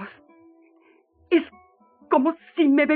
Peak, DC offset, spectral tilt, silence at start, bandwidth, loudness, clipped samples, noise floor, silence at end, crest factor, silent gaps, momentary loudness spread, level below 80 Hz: -8 dBFS; under 0.1%; -2.5 dB/octave; 0 s; 4.5 kHz; -22 LUFS; under 0.1%; -59 dBFS; 0 s; 16 dB; none; 16 LU; -72 dBFS